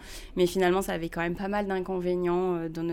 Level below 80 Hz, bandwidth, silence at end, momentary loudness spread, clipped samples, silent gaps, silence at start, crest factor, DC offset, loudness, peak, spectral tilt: -48 dBFS; 17 kHz; 0 s; 6 LU; under 0.1%; none; 0 s; 16 dB; under 0.1%; -28 LUFS; -12 dBFS; -6 dB/octave